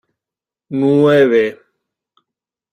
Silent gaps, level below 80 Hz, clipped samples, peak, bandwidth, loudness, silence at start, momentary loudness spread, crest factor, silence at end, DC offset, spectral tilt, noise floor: none; -62 dBFS; under 0.1%; -2 dBFS; 9.4 kHz; -13 LUFS; 0.7 s; 11 LU; 16 dB; 1.2 s; under 0.1%; -7.5 dB/octave; -88 dBFS